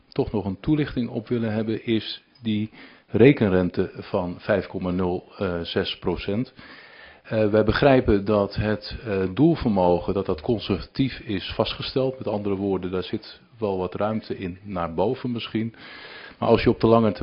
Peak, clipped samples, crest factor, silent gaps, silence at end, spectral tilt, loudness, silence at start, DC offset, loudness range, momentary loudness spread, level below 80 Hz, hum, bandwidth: -2 dBFS; under 0.1%; 22 dB; none; 0 s; -10 dB/octave; -24 LUFS; 0.15 s; under 0.1%; 6 LU; 13 LU; -44 dBFS; none; 5.6 kHz